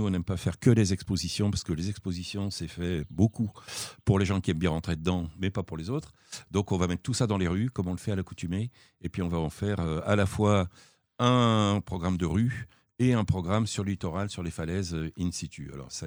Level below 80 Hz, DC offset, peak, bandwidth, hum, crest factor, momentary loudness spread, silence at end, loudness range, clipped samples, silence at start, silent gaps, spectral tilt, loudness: -48 dBFS; under 0.1%; -8 dBFS; over 20 kHz; none; 20 dB; 10 LU; 0 s; 4 LU; under 0.1%; 0 s; none; -6 dB/octave; -29 LUFS